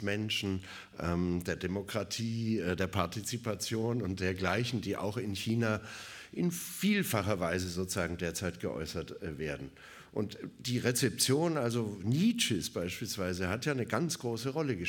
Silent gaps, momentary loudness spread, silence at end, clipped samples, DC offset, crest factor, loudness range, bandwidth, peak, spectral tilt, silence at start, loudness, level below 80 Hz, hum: none; 10 LU; 0 s; under 0.1%; under 0.1%; 20 dB; 4 LU; 17.5 kHz; -12 dBFS; -4.5 dB/octave; 0 s; -34 LUFS; -58 dBFS; none